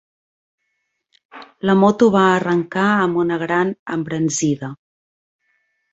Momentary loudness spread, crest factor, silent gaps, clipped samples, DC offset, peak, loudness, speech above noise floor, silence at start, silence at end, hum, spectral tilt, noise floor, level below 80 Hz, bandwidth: 11 LU; 18 dB; 3.79-3.86 s; under 0.1%; under 0.1%; -2 dBFS; -17 LUFS; 56 dB; 1.35 s; 1.15 s; none; -5.5 dB/octave; -73 dBFS; -60 dBFS; 8.2 kHz